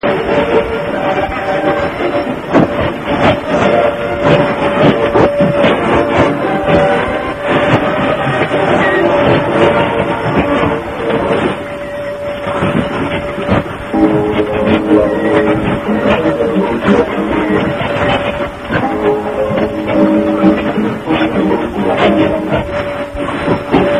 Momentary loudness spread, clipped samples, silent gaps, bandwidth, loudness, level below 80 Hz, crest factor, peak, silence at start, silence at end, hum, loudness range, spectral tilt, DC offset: 6 LU; 0.1%; none; 14 kHz; -13 LUFS; -34 dBFS; 12 dB; 0 dBFS; 0.05 s; 0 s; none; 4 LU; -7 dB/octave; 0.3%